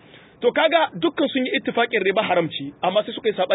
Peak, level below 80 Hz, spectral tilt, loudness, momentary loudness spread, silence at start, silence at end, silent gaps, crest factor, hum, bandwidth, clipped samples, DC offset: -6 dBFS; -68 dBFS; -9.5 dB/octave; -21 LUFS; 6 LU; 0.4 s; 0 s; none; 16 dB; none; 4 kHz; under 0.1%; under 0.1%